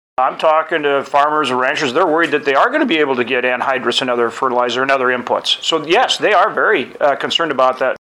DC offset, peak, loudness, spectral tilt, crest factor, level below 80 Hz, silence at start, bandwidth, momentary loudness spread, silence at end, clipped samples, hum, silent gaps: under 0.1%; -2 dBFS; -15 LUFS; -3 dB/octave; 12 dB; -64 dBFS; 0.2 s; 12.5 kHz; 4 LU; 0.2 s; under 0.1%; none; none